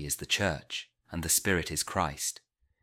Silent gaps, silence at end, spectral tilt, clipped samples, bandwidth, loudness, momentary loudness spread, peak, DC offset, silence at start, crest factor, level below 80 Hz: none; 0.45 s; -2.5 dB/octave; under 0.1%; 17 kHz; -30 LUFS; 13 LU; -12 dBFS; under 0.1%; 0 s; 22 dB; -50 dBFS